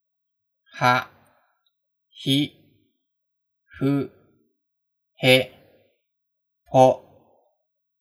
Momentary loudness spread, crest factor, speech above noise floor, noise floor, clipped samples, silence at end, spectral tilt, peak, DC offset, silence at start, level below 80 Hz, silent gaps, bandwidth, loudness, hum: 17 LU; 26 dB; 55 dB; -74 dBFS; under 0.1%; 1.05 s; -5.5 dB/octave; 0 dBFS; under 0.1%; 0.75 s; -70 dBFS; none; over 20 kHz; -21 LUFS; none